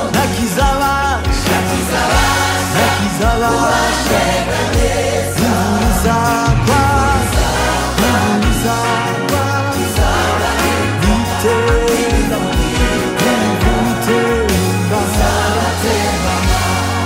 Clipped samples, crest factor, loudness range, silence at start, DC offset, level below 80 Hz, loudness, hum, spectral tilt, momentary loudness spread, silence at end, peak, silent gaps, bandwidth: under 0.1%; 12 dB; 1 LU; 0 s; under 0.1%; -22 dBFS; -14 LUFS; none; -4.5 dB/octave; 3 LU; 0 s; -2 dBFS; none; 16.5 kHz